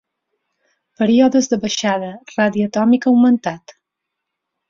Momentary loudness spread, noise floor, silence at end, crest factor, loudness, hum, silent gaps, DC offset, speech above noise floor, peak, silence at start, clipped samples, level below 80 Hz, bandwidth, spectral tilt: 11 LU; -79 dBFS; 1.1 s; 14 dB; -16 LUFS; none; none; under 0.1%; 64 dB; -2 dBFS; 1 s; under 0.1%; -60 dBFS; 7.4 kHz; -5 dB/octave